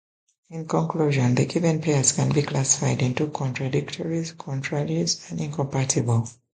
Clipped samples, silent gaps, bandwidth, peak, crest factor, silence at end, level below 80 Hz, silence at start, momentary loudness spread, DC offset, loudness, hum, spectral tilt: under 0.1%; none; 9.6 kHz; -6 dBFS; 18 dB; 0.2 s; -56 dBFS; 0.5 s; 8 LU; under 0.1%; -24 LUFS; none; -5 dB/octave